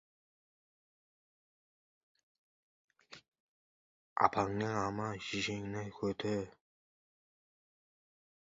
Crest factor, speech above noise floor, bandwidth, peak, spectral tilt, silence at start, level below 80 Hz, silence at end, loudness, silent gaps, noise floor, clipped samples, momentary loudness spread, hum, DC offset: 30 dB; over 54 dB; 7.6 kHz; -12 dBFS; -4 dB/octave; 3.1 s; -68 dBFS; 2.05 s; -36 LUFS; 3.28-3.32 s, 3.40-4.16 s; under -90 dBFS; under 0.1%; 25 LU; none; under 0.1%